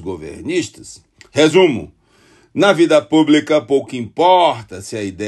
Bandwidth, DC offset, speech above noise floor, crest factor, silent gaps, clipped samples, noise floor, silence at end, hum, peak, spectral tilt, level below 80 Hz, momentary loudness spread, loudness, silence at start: 12 kHz; under 0.1%; 36 dB; 16 dB; none; under 0.1%; -51 dBFS; 0 s; none; 0 dBFS; -5 dB/octave; -52 dBFS; 16 LU; -14 LUFS; 0 s